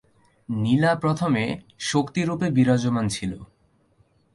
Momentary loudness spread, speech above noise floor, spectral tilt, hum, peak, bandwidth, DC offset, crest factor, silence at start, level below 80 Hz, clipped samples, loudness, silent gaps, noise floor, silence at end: 10 LU; 40 dB; -6 dB/octave; none; -8 dBFS; 11.5 kHz; under 0.1%; 16 dB; 0.5 s; -54 dBFS; under 0.1%; -23 LUFS; none; -62 dBFS; 0.9 s